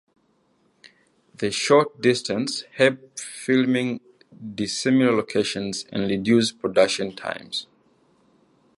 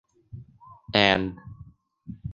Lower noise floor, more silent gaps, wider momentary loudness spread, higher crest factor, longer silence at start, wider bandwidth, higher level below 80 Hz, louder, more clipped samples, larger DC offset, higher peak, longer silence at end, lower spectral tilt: first, -65 dBFS vs -51 dBFS; neither; second, 12 LU vs 26 LU; second, 20 dB vs 28 dB; first, 1.4 s vs 0.35 s; first, 11.5 kHz vs 7.4 kHz; second, -62 dBFS vs -52 dBFS; about the same, -22 LUFS vs -23 LUFS; neither; neither; about the same, -4 dBFS vs -2 dBFS; first, 1.15 s vs 0 s; about the same, -4.5 dB/octave vs -5 dB/octave